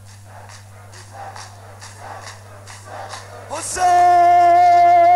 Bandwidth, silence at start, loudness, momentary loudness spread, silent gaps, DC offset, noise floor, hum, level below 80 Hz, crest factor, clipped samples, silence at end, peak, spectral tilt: 12.5 kHz; 0.35 s; -13 LUFS; 25 LU; none; 0.1%; -39 dBFS; 50 Hz at -40 dBFS; -54 dBFS; 10 dB; under 0.1%; 0 s; -6 dBFS; -3.5 dB/octave